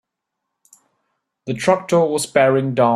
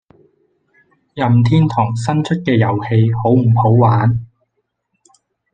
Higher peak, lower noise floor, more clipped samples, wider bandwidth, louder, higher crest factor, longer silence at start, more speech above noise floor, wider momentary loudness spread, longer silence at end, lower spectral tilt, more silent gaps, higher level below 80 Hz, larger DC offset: about the same, -2 dBFS vs -2 dBFS; first, -79 dBFS vs -70 dBFS; neither; first, 14 kHz vs 8.8 kHz; second, -17 LUFS vs -14 LUFS; about the same, 18 dB vs 14 dB; first, 1.45 s vs 1.15 s; first, 63 dB vs 57 dB; first, 10 LU vs 6 LU; second, 0 s vs 1.3 s; second, -5.5 dB/octave vs -8.5 dB/octave; neither; second, -60 dBFS vs -48 dBFS; neither